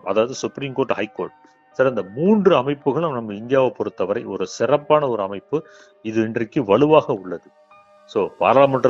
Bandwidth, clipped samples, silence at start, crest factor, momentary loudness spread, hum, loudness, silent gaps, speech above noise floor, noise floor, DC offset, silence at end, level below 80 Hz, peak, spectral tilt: 7.8 kHz; under 0.1%; 0.05 s; 20 dB; 13 LU; none; -20 LUFS; none; 31 dB; -50 dBFS; under 0.1%; 0 s; -62 dBFS; 0 dBFS; -6.5 dB/octave